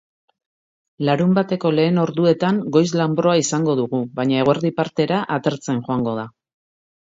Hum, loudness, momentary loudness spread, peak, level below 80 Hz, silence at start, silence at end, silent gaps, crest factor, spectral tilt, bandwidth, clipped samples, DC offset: none; -19 LUFS; 6 LU; -2 dBFS; -60 dBFS; 1 s; 0.8 s; none; 18 dB; -6 dB/octave; 7.8 kHz; under 0.1%; under 0.1%